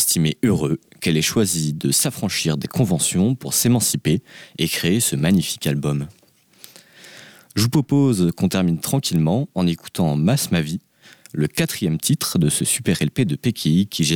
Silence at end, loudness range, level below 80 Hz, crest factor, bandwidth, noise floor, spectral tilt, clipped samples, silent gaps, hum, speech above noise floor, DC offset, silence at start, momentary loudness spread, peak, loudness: 0 s; 3 LU; -48 dBFS; 12 dB; 20 kHz; -48 dBFS; -4.5 dB/octave; under 0.1%; none; none; 29 dB; under 0.1%; 0 s; 6 LU; -8 dBFS; -20 LUFS